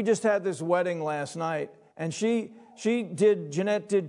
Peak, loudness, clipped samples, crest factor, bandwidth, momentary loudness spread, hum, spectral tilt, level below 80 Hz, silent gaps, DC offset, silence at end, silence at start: -12 dBFS; -28 LUFS; under 0.1%; 16 dB; 11 kHz; 10 LU; none; -5.5 dB/octave; -82 dBFS; none; under 0.1%; 0 s; 0 s